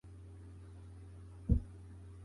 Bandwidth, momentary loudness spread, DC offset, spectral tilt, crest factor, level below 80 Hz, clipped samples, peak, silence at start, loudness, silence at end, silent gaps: 11 kHz; 18 LU; under 0.1%; -10 dB/octave; 24 dB; -44 dBFS; under 0.1%; -18 dBFS; 0.05 s; -37 LUFS; 0 s; none